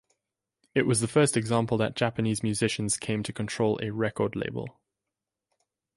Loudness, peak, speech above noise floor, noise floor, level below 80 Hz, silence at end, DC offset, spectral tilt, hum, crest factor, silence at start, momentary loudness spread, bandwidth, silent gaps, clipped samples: -27 LUFS; -10 dBFS; 61 dB; -88 dBFS; -60 dBFS; 1.25 s; under 0.1%; -5 dB/octave; none; 18 dB; 0.75 s; 9 LU; 11.5 kHz; none; under 0.1%